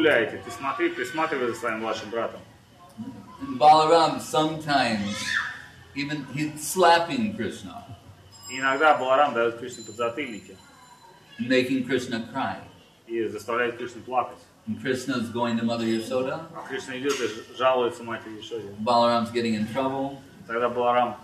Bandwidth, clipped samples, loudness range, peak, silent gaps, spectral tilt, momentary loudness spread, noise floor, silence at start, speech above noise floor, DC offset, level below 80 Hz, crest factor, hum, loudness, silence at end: 15 kHz; under 0.1%; 6 LU; -8 dBFS; none; -4.5 dB/octave; 16 LU; -51 dBFS; 0 s; 26 dB; under 0.1%; -64 dBFS; 18 dB; none; -25 LUFS; 0 s